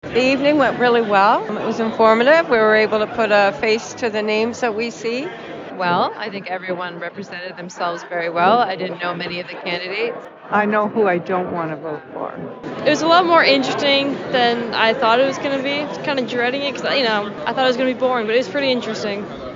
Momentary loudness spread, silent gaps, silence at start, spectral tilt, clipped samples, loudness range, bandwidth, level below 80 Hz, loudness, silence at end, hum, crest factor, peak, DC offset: 14 LU; none; 0.05 s; -4.5 dB/octave; under 0.1%; 7 LU; 7.6 kHz; -58 dBFS; -18 LUFS; 0 s; none; 18 dB; -2 dBFS; under 0.1%